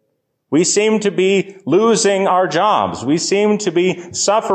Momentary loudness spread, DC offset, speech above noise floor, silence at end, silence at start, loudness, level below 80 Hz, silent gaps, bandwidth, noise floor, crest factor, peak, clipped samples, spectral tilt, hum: 5 LU; under 0.1%; 54 dB; 0 s; 0.5 s; -15 LUFS; -56 dBFS; none; 9.8 kHz; -69 dBFS; 12 dB; -4 dBFS; under 0.1%; -4 dB/octave; none